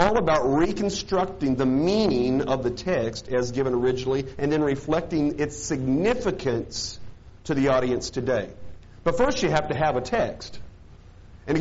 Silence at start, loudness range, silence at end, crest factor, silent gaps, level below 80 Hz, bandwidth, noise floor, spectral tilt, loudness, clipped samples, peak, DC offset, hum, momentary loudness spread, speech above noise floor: 0 s; 2 LU; 0 s; 22 dB; none; -44 dBFS; 8 kHz; -47 dBFS; -5 dB/octave; -24 LUFS; under 0.1%; -2 dBFS; under 0.1%; none; 8 LU; 23 dB